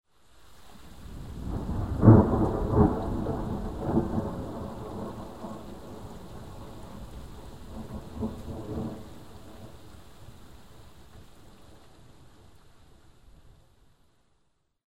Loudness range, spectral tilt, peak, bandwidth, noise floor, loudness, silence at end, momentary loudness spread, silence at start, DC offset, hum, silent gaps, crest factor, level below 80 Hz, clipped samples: 18 LU; -9.5 dB/octave; -4 dBFS; 12 kHz; -73 dBFS; -28 LUFS; 0.1 s; 25 LU; 0.05 s; 0.4%; none; none; 26 dB; -42 dBFS; under 0.1%